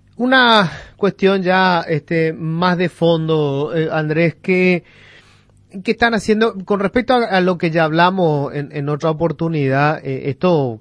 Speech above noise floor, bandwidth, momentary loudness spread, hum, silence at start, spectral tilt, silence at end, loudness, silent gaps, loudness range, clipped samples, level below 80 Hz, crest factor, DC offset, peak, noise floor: 34 dB; 10.5 kHz; 7 LU; none; 0.2 s; -6.5 dB/octave; 0 s; -16 LUFS; none; 3 LU; under 0.1%; -50 dBFS; 16 dB; under 0.1%; 0 dBFS; -50 dBFS